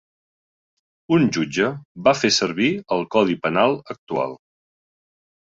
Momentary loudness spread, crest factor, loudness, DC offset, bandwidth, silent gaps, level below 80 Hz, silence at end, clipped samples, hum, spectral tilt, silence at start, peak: 8 LU; 20 dB; -20 LUFS; under 0.1%; 7.8 kHz; 1.85-1.95 s, 3.98-4.07 s; -60 dBFS; 1.05 s; under 0.1%; none; -4.5 dB/octave; 1.1 s; -2 dBFS